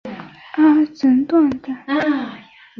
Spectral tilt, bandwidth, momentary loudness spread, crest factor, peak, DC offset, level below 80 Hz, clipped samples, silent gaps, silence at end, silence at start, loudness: -7 dB/octave; 6.4 kHz; 17 LU; 14 dB; -4 dBFS; under 0.1%; -60 dBFS; under 0.1%; none; 0.4 s; 0.05 s; -17 LUFS